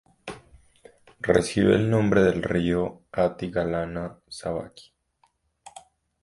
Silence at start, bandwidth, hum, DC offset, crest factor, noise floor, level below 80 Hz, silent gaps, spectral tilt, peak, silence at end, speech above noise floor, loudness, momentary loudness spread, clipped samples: 0.25 s; 11.5 kHz; none; under 0.1%; 22 dB; -68 dBFS; -48 dBFS; none; -6.5 dB/octave; -4 dBFS; 0.45 s; 44 dB; -24 LUFS; 20 LU; under 0.1%